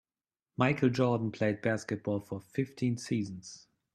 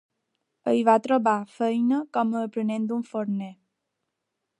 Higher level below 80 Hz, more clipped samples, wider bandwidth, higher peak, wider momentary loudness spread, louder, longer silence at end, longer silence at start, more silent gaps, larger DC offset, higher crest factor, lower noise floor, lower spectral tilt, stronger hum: first, -68 dBFS vs -80 dBFS; neither; first, 13 kHz vs 10.5 kHz; second, -12 dBFS vs -6 dBFS; first, 16 LU vs 10 LU; second, -32 LUFS vs -25 LUFS; second, 0.35 s vs 1.05 s; about the same, 0.6 s vs 0.65 s; neither; neither; about the same, 22 dB vs 20 dB; first, under -90 dBFS vs -82 dBFS; about the same, -6.5 dB/octave vs -7 dB/octave; neither